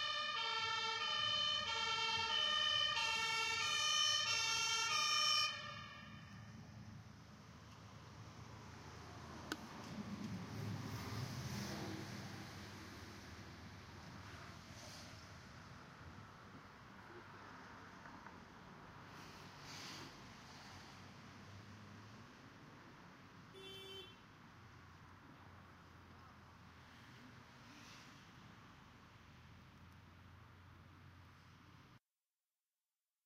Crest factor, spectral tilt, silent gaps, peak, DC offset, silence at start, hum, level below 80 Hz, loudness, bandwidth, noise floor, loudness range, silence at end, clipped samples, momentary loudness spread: 22 dB; -1.5 dB/octave; none; -24 dBFS; under 0.1%; 0 s; none; -74 dBFS; -39 LUFS; 16 kHz; under -90 dBFS; 25 LU; 1.3 s; under 0.1%; 26 LU